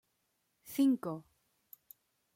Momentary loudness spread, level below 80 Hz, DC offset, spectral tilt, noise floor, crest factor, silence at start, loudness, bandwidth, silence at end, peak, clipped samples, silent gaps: 25 LU; -82 dBFS; under 0.1%; -6 dB/octave; -80 dBFS; 18 dB; 0.65 s; -33 LUFS; 16.5 kHz; 1.15 s; -20 dBFS; under 0.1%; none